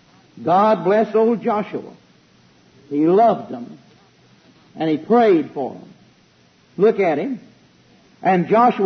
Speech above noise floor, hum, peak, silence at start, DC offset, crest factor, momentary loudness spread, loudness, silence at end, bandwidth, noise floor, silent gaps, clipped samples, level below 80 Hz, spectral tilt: 37 dB; none; -6 dBFS; 0.35 s; under 0.1%; 14 dB; 18 LU; -18 LUFS; 0 s; 6.4 kHz; -54 dBFS; none; under 0.1%; -70 dBFS; -8.5 dB/octave